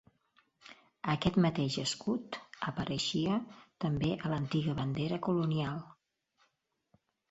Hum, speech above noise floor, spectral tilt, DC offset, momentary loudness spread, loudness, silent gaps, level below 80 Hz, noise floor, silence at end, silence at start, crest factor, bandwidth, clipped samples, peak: none; 46 dB; -6 dB/octave; under 0.1%; 9 LU; -34 LUFS; none; -60 dBFS; -79 dBFS; 1.4 s; 0.65 s; 18 dB; 8.2 kHz; under 0.1%; -16 dBFS